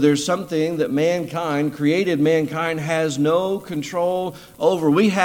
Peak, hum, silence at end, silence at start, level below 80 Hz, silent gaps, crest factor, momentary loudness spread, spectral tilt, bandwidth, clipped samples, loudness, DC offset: -2 dBFS; none; 0 s; 0 s; -58 dBFS; none; 18 dB; 6 LU; -5.5 dB/octave; 17 kHz; under 0.1%; -20 LUFS; under 0.1%